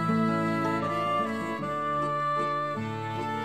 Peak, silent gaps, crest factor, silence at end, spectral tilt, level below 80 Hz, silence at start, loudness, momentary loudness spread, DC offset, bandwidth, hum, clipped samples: -16 dBFS; none; 14 dB; 0 s; -7 dB/octave; -62 dBFS; 0 s; -29 LUFS; 6 LU; 0.2%; 14.5 kHz; none; under 0.1%